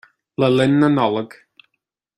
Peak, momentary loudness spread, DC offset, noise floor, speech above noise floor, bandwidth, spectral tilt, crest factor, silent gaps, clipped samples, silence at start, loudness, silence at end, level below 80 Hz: -2 dBFS; 16 LU; under 0.1%; -76 dBFS; 60 dB; 10.5 kHz; -7.5 dB/octave; 16 dB; none; under 0.1%; 0.4 s; -17 LUFS; 0.9 s; -60 dBFS